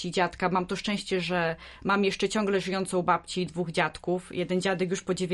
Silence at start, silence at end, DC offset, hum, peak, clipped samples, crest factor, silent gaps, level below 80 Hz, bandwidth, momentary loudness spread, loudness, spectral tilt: 0 s; 0 s; under 0.1%; none; -10 dBFS; under 0.1%; 18 dB; none; -56 dBFS; 11.5 kHz; 5 LU; -28 LUFS; -5 dB/octave